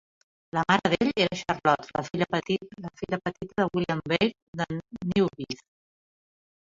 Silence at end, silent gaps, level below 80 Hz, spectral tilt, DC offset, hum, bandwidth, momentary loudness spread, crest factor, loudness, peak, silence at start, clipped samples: 1.2 s; 4.42-4.53 s; -58 dBFS; -5.5 dB/octave; under 0.1%; none; 7.6 kHz; 10 LU; 22 dB; -27 LUFS; -6 dBFS; 0.55 s; under 0.1%